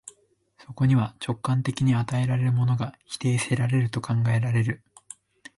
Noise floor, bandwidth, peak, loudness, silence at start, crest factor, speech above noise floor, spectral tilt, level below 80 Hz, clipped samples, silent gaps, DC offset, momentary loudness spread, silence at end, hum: -62 dBFS; 11.5 kHz; -12 dBFS; -25 LUFS; 0.05 s; 14 dB; 39 dB; -6.5 dB/octave; -56 dBFS; under 0.1%; none; under 0.1%; 16 LU; 0.8 s; none